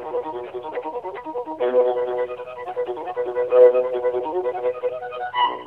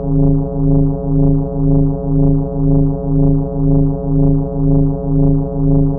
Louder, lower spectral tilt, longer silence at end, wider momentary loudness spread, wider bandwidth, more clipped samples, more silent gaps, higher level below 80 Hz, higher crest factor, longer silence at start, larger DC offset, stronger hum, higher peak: second, -23 LUFS vs -15 LUFS; second, -6 dB/octave vs -15 dB/octave; about the same, 0 s vs 0 s; first, 16 LU vs 2 LU; first, 4.1 kHz vs 1.5 kHz; neither; neither; second, -66 dBFS vs -18 dBFS; first, 18 dB vs 8 dB; about the same, 0 s vs 0 s; neither; second, none vs 50 Hz at -20 dBFS; about the same, -4 dBFS vs -4 dBFS